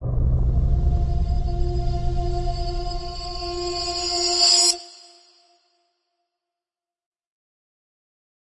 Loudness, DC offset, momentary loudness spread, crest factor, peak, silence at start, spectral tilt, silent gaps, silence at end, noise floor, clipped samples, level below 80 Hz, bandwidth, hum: -22 LUFS; under 0.1%; 15 LU; 18 dB; -6 dBFS; 0 s; -3.5 dB/octave; none; 3.6 s; under -90 dBFS; under 0.1%; -26 dBFS; 11.5 kHz; none